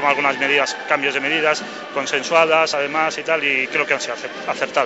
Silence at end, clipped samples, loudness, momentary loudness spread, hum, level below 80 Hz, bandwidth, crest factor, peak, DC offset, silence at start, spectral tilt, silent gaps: 0 s; under 0.1%; -18 LUFS; 9 LU; none; -70 dBFS; 8.2 kHz; 18 dB; -2 dBFS; under 0.1%; 0 s; -2 dB/octave; none